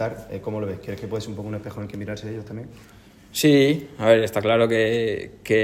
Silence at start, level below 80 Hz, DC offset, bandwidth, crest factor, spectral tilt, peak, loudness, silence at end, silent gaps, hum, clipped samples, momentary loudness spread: 0 s; -54 dBFS; under 0.1%; 16 kHz; 20 dB; -5.5 dB/octave; -2 dBFS; -22 LUFS; 0 s; none; none; under 0.1%; 16 LU